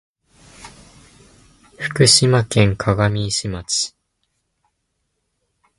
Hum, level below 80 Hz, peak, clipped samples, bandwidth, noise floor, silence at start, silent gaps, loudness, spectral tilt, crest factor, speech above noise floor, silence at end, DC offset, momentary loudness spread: none; -44 dBFS; 0 dBFS; under 0.1%; 11.5 kHz; -72 dBFS; 0.6 s; none; -17 LUFS; -4 dB/octave; 20 dB; 56 dB; 1.9 s; under 0.1%; 14 LU